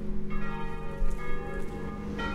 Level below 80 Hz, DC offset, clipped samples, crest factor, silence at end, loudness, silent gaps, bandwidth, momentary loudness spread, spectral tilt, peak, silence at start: -32 dBFS; under 0.1%; under 0.1%; 12 dB; 0 s; -37 LUFS; none; 6.4 kHz; 2 LU; -7 dB/octave; -16 dBFS; 0 s